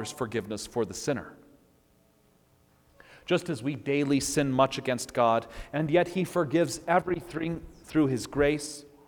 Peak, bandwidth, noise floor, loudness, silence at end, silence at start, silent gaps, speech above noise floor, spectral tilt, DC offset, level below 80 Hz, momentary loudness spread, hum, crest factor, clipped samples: -10 dBFS; 19.5 kHz; -64 dBFS; -28 LUFS; 0.2 s; 0 s; none; 36 dB; -5 dB/octave; under 0.1%; -54 dBFS; 8 LU; none; 20 dB; under 0.1%